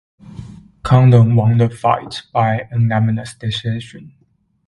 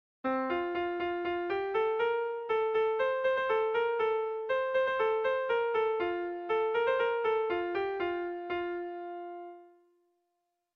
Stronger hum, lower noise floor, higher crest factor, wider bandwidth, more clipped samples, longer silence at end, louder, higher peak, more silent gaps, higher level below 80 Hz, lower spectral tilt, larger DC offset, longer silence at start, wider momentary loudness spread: neither; second, -35 dBFS vs -82 dBFS; about the same, 16 dB vs 12 dB; first, 11 kHz vs 5.4 kHz; neither; second, 0.6 s vs 1.1 s; first, -15 LUFS vs -31 LUFS; first, 0 dBFS vs -18 dBFS; neither; first, -44 dBFS vs -68 dBFS; first, -7.5 dB/octave vs -6 dB/octave; neither; about the same, 0.3 s vs 0.25 s; first, 21 LU vs 7 LU